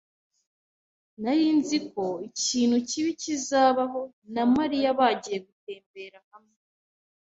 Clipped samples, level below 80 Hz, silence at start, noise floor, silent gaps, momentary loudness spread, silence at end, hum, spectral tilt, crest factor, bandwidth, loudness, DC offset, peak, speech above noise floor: under 0.1%; -68 dBFS; 1.2 s; under -90 dBFS; 4.13-4.22 s, 5.52-5.67 s, 5.86-5.94 s, 6.24-6.31 s; 20 LU; 0.85 s; none; -3 dB/octave; 18 dB; 8.2 kHz; -25 LUFS; under 0.1%; -8 dBFS; over 64 dB